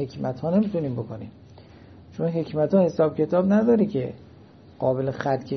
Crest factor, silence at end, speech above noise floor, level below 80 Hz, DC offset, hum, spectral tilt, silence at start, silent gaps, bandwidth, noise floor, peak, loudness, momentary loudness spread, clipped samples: 16 dB; 0 s; 26 dB; -58 dBFS; under 0.1%; none; -9 dB/octave; 0 s; none; 6.4 kHz; -49 dBFS; -8 dBFS; -23 LUFS; 14 LU; under 0.1%